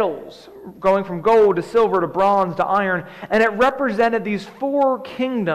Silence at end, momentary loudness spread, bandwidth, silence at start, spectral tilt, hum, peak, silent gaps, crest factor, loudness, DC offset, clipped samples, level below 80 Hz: 0 s; 9 LU; 12.5 kHz; 0 s; -6.5 dB/octave; none; -8 dBFS; none; 12 dB; -19 LUFS; under 0.1%; under 0.1%; -54 dBFS